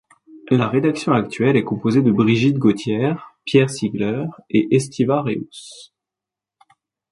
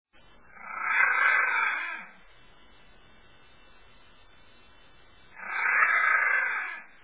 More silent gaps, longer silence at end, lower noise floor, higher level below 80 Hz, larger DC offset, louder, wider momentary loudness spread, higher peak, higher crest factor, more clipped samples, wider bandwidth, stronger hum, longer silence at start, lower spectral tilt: neither; first, 1.25 s vs 0.2 s; first, -87 dBFS vs -58 dBFS; first, -58 dBFS vs -68 dBFS; second, under 0.1% vs 0.2%; first, -19 LUFS vs -24 LUFS; second, 10 LU vs 18 LU; first, -2 dBFS vs -10 dBFS; about the same, 18 dB vs 20 dB; neither; first, 11.5 kHz vs 4 kHz; neither; second, 0.35 s vs 0.6 s; first, -7 dB/octave vs 2 dB/octave